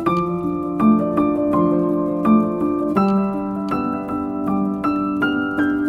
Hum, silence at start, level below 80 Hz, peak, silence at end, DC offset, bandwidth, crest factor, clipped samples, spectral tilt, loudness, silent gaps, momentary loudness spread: none; 0 s; -48 dBFS; -4 dBFS; 0 s; under 0.1%; 5.8 kHz; 14 dB; under 0.1%; -9 dB/octave; -19 LUFS; none; 7 LU